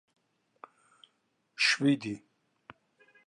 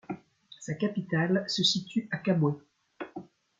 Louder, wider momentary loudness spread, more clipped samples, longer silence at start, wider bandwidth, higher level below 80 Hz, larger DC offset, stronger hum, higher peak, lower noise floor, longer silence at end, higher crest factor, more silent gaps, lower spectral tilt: about the same, -28 LUFS vs -29 LUFS; first, 20 LU vs 17 LU; neither; first, 1.6 s vs 0.1 s; first, 11.5 kHz vs 9.2 kHz; second, -80 dBFS vs -72 dBFS; neither; neither; about the same, -12 dBFS vs -12 dBFS; first, -76 dBFS vs -53 dBFS; first, 1.1 s vs 0.4 s; first, 24 dB vs 18 dB; neither; second, -3.5 dB/octave vs -5 dB/octave